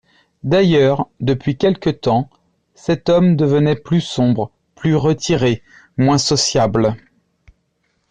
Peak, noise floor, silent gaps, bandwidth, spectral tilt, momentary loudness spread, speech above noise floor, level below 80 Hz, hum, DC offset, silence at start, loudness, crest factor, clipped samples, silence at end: -4 dBFS; -66 dBFS; none; 9.8 kHz; -5.5 dB/octave; 11 LU; 51 dB; -46 dBFS; none; under 0.1%; 0.45 s; -16 LUFS; 12 dB; under 0.1%; 1.15 s